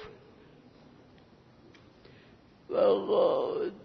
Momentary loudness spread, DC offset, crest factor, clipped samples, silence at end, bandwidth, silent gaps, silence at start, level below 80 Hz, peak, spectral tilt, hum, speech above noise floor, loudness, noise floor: 9 LU; under 0.1%; 18 dB; under 0.1%; 0 s; 5.8 kHz; none; 0 s; -70 dBFS; -14 dBFS; -7.5 dB/octave; none; 31 dB; -28 LUFS; -58 dBFS